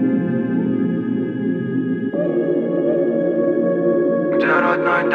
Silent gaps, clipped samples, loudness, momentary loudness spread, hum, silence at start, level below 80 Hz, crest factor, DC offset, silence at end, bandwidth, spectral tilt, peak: none; under 0.1%; -19 LUFS; 5 LU; none; 0 s; -62 dBFS; 14 dB; under 0.1%; 0 s; 5 kHz; -9.5 dB/octave; -4 dBFS